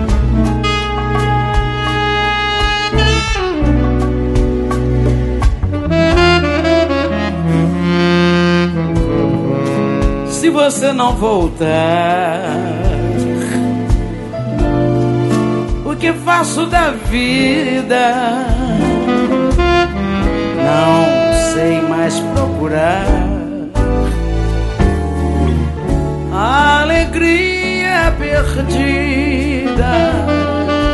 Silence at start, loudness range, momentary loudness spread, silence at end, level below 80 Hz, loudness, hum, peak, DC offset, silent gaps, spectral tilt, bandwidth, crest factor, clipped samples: 0 s; 3 LU; 5 LU; 0 s; -20 dBFS; -14 LUFS; none; 0 dBFS; under 0.1%; none; -6 dB/octave; 12 kHz; 14 dB; under 0.1%